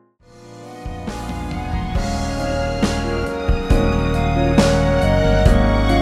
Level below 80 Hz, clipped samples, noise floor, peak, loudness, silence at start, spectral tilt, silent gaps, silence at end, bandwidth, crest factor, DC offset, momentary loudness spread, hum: -22 dBFS; under 0.1%; -45 dBFS; 0 dBFS; -19 LUFS; 0.4 s; -6.5 dB/octave; none; 0 s; 13.5 kHz; 18 dB; under 0.1%; 14 LU; none